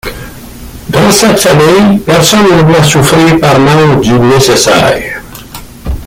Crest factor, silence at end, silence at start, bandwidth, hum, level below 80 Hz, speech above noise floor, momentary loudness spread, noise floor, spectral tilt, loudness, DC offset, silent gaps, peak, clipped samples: 6 dB; 0 s; 0.05 s; 17 kHz; none; -28 dBFS; 21 dB; 19 LU; -26 dBFS; -4.5 dB/octave; -5 LUFS; under 0.1%; none; 0 dBFS; 0.3%